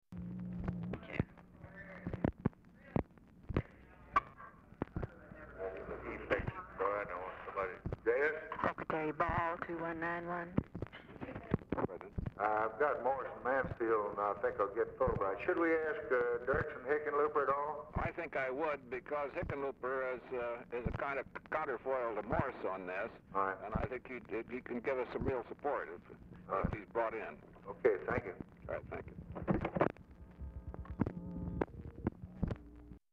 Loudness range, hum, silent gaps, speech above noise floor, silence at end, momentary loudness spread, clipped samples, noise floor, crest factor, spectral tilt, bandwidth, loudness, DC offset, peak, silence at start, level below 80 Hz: 7 LU; none; none; 21 dB; 0.15 s; 14 LU; under 0.1%; -58 dBFS; 22 dB; -9 dB/octave; 7 kHz; -39 LUFS; under 0.1%; -18 dBFS; 0.1 s; -54 dBFS